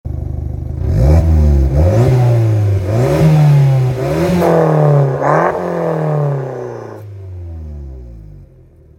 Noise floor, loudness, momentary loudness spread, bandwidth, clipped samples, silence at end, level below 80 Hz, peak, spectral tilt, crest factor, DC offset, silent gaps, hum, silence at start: -42 dBFS; -13 LUFS; 18 LU; 15.5 kHz; under 0.1%; 0.55 s; -22 dBFS; 0 dBFS; -8.5 dB/octave; 12 dB; under 0.1%; none; none; 0.05 s